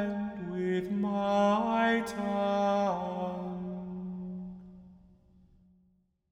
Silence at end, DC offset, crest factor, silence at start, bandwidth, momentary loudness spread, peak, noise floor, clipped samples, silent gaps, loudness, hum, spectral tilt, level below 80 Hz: 1.35 s; under 0.1%; 16 dB; 0 s; 13 kHz; 14 LU; -16 dBFS; -70 dBFS; under 0.1%; none; -31 LUFS; none; -6.5 dB/octave; -62 dBFS